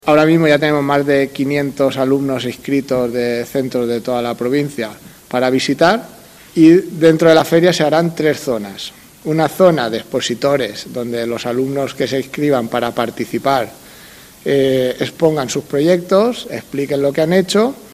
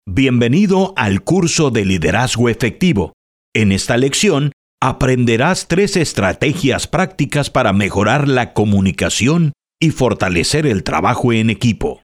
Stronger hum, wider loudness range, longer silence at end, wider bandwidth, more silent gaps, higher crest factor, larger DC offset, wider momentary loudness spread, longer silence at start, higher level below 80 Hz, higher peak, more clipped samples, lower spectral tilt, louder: neither; first, 6 LU vs 1 LU; about the same, 0.05 s vs 0.1 s; about the same, 15 kHz vs 15 kHz; second, none vs 3.13-3.52 s, 4.53-4.78 s; about the same, 16 dB vs 14 dB; neither; first, 11 LU vs 4 LU; about the same, 0.05 s vs 0.05 s; second, -52 dBFS vs -36 dBFS; about the same, 0 dBFS vs 0 dBFS; neither; about the same, -5.5 dB/octave vs -5 dB/octave; about the same, -15 LUFS vs -15 LUFS